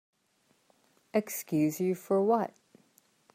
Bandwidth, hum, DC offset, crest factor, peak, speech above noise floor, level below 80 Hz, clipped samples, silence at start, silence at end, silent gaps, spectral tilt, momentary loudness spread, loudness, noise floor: 16 kHz; none; under 0.1%; 18 dB; -14 dBFS; 43 dB; -80 dBFS; under 0.1%; 1.15 s; 0.9 s; none; -6.5 dB/octave; 6 LU; -30 LUFS; -71 dBFS